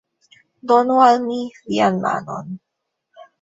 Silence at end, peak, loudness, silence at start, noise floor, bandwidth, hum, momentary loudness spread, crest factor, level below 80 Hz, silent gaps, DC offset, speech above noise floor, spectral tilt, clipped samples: 0.85 s; -2 dBFS; -17 LUFS; 0.65 s; -69 dBFS; 8 kHz; none; 20 LU; 18 dB; -64 dBFS; none; under 0.1%; 52 dB; -6 dB/octave; under 0.1%